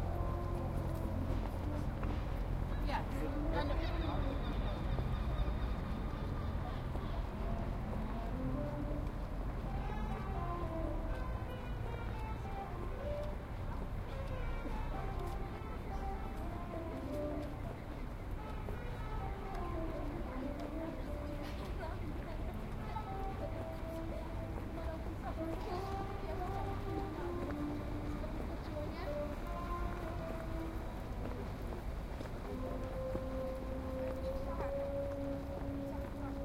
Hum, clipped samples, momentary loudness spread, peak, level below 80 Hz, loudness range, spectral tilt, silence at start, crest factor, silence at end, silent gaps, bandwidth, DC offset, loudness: none; under 0.1%; 5 LU; -24 dBFS; -42 dBFS; 4 LU; -7.5 dB/octave; 0 s; 16 dB; 0 s; none; 16 kHz; under 0.1%; -42 LUFS